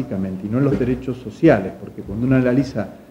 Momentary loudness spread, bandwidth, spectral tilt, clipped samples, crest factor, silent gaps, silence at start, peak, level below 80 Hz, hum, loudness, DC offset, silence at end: 13 LU; 9.4 kHz; -9 dB/octave; under 0.1%; 18 dB; none; 0 s; -2 dBFS; -42 dBFS; none; -19 LUFS; under 0.1%; 0.05 s